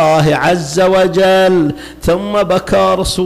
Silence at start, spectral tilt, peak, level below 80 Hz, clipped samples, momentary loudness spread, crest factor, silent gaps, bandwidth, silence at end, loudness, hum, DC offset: 0 s; -5 dB/octave; -4 dBFS; -32 dBFS; under 0.1%; 6 LU; 6 dB; none; 15.5 kHz; 0 s; -12 LUFS; none; under 0.1%